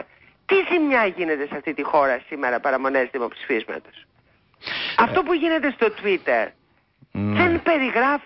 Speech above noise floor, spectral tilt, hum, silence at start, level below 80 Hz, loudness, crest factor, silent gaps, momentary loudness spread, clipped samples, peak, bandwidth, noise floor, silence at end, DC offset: 39 dB; -10 dB/octave; none; 0 s; -52 dBFS; -21 LUFS; 16 dB; none; 10 LU; under 0.1%; -6 dBFS; 5.8 kHz; -60 dBFS; 0 s; under 0.1%